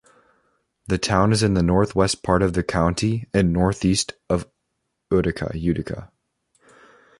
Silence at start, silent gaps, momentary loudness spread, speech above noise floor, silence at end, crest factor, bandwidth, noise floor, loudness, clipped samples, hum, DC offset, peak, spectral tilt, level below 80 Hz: 0.9 s; none; 7 LU; 56 dB; 1.15 s; 20 dB; 11.5 kHz; -76 dBFS; -21 LUFS; under 0.1%; none; under 0.1%; -2 dBFS; -5.5 dB/octave; -38 dBFS